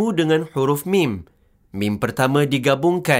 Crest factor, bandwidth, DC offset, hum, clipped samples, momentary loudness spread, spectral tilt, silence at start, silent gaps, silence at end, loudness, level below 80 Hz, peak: 16 dB; 16 kHz; under 0.1%; none; under 0.1%; 7 LU; -6 dB/octave; 0 s; none; 0 s; -19 LUFS; -56 dBFS; -2 dBFS